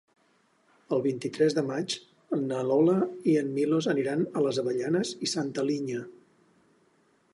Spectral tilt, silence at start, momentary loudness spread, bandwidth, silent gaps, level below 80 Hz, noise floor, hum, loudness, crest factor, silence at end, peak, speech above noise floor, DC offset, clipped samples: -5.5 dB/octave; 0.9 s; 9 LU; 11.5 kHz; none; -76 dBFS; -67 dBFS; none; -28 LUFS; 16 dB; 1.25 s; -12 dBFS; 40 dB; under 0.1%; under 0.1%